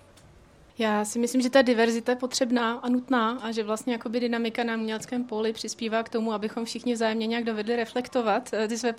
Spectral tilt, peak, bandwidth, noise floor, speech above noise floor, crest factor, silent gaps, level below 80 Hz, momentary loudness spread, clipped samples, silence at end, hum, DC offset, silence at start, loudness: -3.5 dB/octave; -8 dBFS; 15 kHz; -54 dBFS; 28 dB; 18 dB; none; -68 dBFS; 8 LU; under 0.1%; 0 s; none; under 0.1%; 0.8 s; -27 LUFS